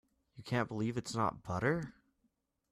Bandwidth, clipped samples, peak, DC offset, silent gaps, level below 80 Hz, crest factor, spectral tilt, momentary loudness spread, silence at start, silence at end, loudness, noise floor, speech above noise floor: 13.5 kHz; under 0.1%; -18 dBFS; under 0.1%; none; -64 dBFS; 20 dB; -6 dB/octave; 8 LU; 0.35 s; 0.8 s; -36 LUFS; -80 dBFS; 44 dB